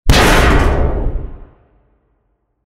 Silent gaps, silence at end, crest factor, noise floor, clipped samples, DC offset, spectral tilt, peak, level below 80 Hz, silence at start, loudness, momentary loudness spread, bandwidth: none; 1.25 s; 14 dB; -64 dBFS; under 0.1%; under 0.1%; -4.5 dB/octave; 0 dBFS; -18 dBFS; 0.05 s; -13 LUFS; 18 LU; 16 kHz